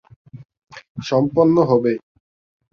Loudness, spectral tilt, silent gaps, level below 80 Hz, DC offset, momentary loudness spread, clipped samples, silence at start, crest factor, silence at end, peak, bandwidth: -17 LUFS; -8 dB/octave; 0.89-0.95 s; -56 dBFS; under 0.1%; 16 LU; under 0.1%; 0.35 s; 16 dB; 0.75 s; -4 dBFS; 6.8 kHz